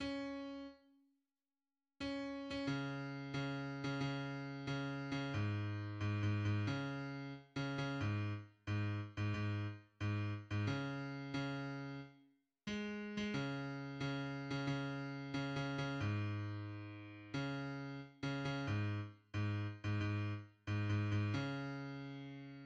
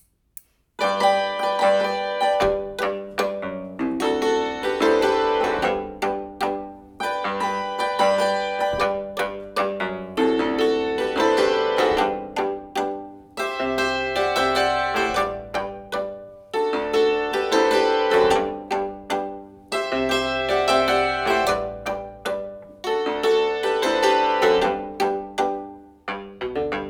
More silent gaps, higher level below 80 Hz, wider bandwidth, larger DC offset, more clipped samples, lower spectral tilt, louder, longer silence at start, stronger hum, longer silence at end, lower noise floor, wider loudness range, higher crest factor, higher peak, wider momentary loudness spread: neither; second, -68 dBFS vs -50 dBFS; second, 7.8 kHz vs over 20 kHz; neither; neither; first, -7 dB/octave vs -3.5 dB/octave; second, -43 LUFS vs -22 LUFS; second, 0 s vs 0.8 s; neither; about the same, 0 s vs 0 s; first, under -90 dBFS vs -47 dBFS; about the same, 3 LU vs 2 LU; about the same, 16 dB vs 16 dB; second, -26 dBFS vs -6 dBFS; second, 8 LU vs 11 LU